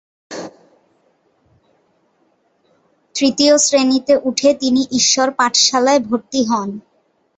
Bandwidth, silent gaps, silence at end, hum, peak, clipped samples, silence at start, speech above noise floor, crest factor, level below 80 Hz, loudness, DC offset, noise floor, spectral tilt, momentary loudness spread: 8.2 kHz; none; 0.55 s; none; 0 dBFS; under 0.1%; 0.3 s; 46 dB; 16 dB; -60 dBFS; -14 LUFS; under 0.1%; -61 dBFS; -2 dB/octave; 19 LU